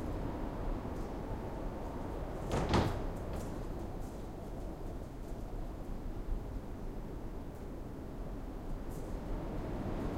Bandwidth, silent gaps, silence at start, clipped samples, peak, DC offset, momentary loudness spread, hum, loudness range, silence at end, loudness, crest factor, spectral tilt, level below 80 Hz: 16 kHz; none; 0 s; under 0.1%; -18 dBFS; 0.1%; 8 LU; none; 7 LU; 0 s; -42 LUFS; 22 dB; -7 dB/octave; -42 dBFS